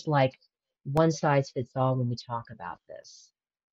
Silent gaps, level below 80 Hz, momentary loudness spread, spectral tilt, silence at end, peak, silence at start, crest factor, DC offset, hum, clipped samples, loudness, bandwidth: none; -60 dBFS; 20 LU; -6.5 dB/octave; 0.6 s; -10 dBFS; 0.05 s; 18 dB; under 0.1%; none; under 0.1%; -28 LUFS; 8.2 kHz